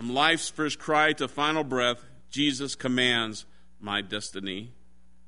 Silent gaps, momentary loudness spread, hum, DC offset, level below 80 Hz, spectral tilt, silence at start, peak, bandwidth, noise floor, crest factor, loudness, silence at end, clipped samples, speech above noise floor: none; 13 LU; none; 0.5%; -60 dBFS; -3 dB/octave; 0 s; -6 dBFS; 11 kHz; -61 dBFS; 22 dB; -27 LUFS; 0.55 s; under 0.1%; 34 dB